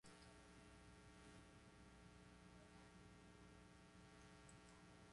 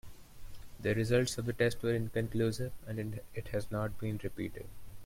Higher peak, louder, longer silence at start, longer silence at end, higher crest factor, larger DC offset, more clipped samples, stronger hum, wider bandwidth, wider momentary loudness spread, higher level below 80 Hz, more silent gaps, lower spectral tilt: second, -48 dBFS vs -16 dBFS; second, -66 LUFS vs -35 LUFS; about the same, 0.05 s vs 0.05 s; about the same, 0 s vs 0 s; about the same, 18 dB vs 18 dB; neither; neither; neither; second, 11 kHz vs 16.5 kHz; second, 2 LU vs 13 LU; second, -74 dBFS vs -52 dBFS; neither; second, -4.5 dB/octave vs -6 dB/octave